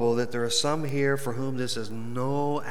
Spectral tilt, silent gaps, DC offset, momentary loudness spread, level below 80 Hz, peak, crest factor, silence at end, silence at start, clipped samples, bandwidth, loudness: -4.5 dB/octave; none; 3%; 6 LU; -68 dBFS; -12 dBFS; 16 dB; 0 s; 0 s; under 0.1%; 20 kHz; -28 LUFS